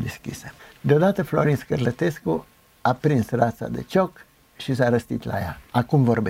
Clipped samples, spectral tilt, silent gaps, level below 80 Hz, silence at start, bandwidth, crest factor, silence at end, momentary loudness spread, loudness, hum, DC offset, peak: under 0.1%; -7.5 dB/octave; none; -50 dBFS; 0 s; 16 kHz; 18 dB; 0 s; 12 LU; -23 LUFS; none; under 0.1%; -4 dBFS